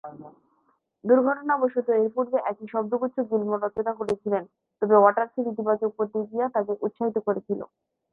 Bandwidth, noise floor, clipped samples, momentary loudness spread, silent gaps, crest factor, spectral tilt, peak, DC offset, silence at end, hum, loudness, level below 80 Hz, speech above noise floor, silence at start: 6.2 kHz; -69 dBFS; under 0.1%; 9 LU; none; 20 dB; -9 dB/octave; -4 dBFS; under 0.1%; 0.45 s; none; -25 LUFS; -70 dBFS; 44 dB; 0.05 s